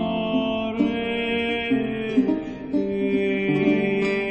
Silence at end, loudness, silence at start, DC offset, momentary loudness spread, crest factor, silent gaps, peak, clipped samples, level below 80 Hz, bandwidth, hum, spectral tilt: 0 s; -23 LUFS; 0 s; 0.1%; 4 LU; 16 dB; none; -6 dBFS; under 0.1%; -50 dBFS; 8.4 kHz; none; -7 dB/octave